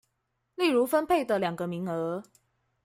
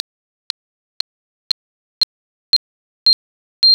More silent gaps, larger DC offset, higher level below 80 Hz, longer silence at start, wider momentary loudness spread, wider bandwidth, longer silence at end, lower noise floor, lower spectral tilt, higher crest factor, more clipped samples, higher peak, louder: second, none vs 2.03-3.06 s, 3.13-3.62 s; neither; about the same, -66 dBFS vs -68 dBFS; second, 0.6 s vs 2 s; second, 10 LU vs 15 LU; second, 16 kHz vs over 20 kHz; first, 0.65 s vs 0 s; second, -79 dBFS vs under -90 dBFS; first, -5.5 dB/octave vs 2 dB/octave; about the same, 16 dB vs 14 dB; neither; second, -12 dBFS vs -6 dBFS; second, -28 LUFS vs -18 LUFS